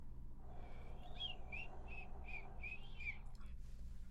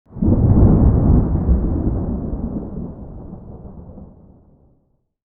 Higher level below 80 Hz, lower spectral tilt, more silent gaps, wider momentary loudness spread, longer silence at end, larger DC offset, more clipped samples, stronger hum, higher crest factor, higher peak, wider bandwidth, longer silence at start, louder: second, -52 dBFS vs -22 dBFS; second, -5 dB/octave vs -15.5 dB/octave; neither; second, 10 LU vs 24 LU; second, 0 s vs 1.2 s; neither; neither; neither; about the same, 12 dB vs 16 dB; second, -36 dBFS vs -2 dBFS; first, 7.4 kHz vs 2 kHz; second, 0 s vs 0.15 s; second, -52 LUFS vs -17 LUFS